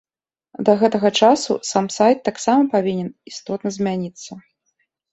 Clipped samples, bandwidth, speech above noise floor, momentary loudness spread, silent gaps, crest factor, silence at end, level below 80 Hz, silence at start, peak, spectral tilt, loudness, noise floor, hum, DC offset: under 0.1%; 8.2 kHz; 66 dB; 15 LU; none; 18 dB; 0.75 s; -62 dBFS; 0.6 s; -2 dBFS; -4.5 dB/octave; -18 LUFS; -84 dBFS; none; under 0.1%